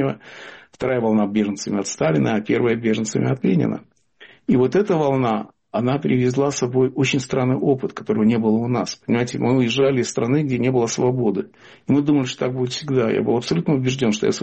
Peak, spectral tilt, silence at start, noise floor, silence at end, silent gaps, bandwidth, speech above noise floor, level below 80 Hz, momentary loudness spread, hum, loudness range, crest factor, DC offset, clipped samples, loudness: -8 dBFS; -6 dB/octave; 0 s; -49 dBFS; 0 s; none; 8.4 kHz; 30 dB; -56 dBFS; 7 LU; none; 1 LU; 12 dB; under 0.1%; under 0.1%; -20 LUFS